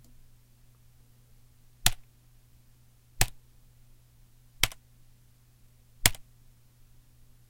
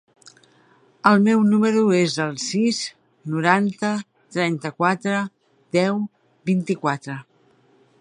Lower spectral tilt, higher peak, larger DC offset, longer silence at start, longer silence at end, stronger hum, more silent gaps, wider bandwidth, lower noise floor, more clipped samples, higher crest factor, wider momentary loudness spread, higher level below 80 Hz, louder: second, -1 dB/octave vs -5.5 dB/octave; about the same, 0 dBFS vs -2 dBFS; neither; first, 1.85 s vs 1.05 s; first, 1.3 s vs 0.8 s; neither; neither; first, 16 kHz vs 10.5 kHz; about the same, -59 dBFS vs -58 dBFS; neither; first, 36 dB vs 20 dB; first, 25 LU vs 15 LU; first, -44 dBFS vs -70 dBFS; second, -29 LUFS vs -21 LUFS